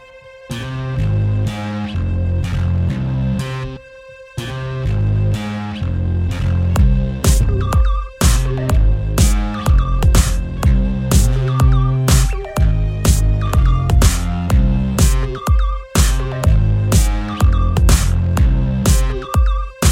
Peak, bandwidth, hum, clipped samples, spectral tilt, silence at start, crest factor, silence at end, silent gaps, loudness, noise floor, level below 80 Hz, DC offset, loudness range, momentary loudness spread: 0 dBFS; 16.5 kHz; none; under 0.1%; -5.5 dB/octave; 0.15 s; 14 dB; 0 s; none; -17 LUFS; -39 dBFS; -18 dBFS; under 0.1%; 5 LU; 8 LU